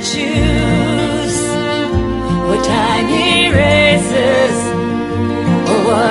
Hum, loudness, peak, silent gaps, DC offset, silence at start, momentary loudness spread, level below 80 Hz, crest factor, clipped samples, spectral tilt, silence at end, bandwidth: none; -13 LUFS; 0 dBFS; none; under 0.1%; 0 s; 7 LU; -28 dBFS; 14 dB; under 0.1%; -5 dB/octave; 0 s; 11.5 kHz